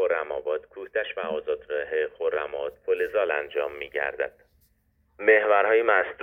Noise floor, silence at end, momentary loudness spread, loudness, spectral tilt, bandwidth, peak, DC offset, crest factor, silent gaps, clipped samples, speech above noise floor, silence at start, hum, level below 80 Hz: -67 dBFS; 0 s; 12 LU; -26 LUFS; -5.5 dB/octave; 3.8 kHz; -6 dBFS; under 0.1%; 20 dB; none; under 0.1%; 42 dB; 0 s; none; -64 dBFS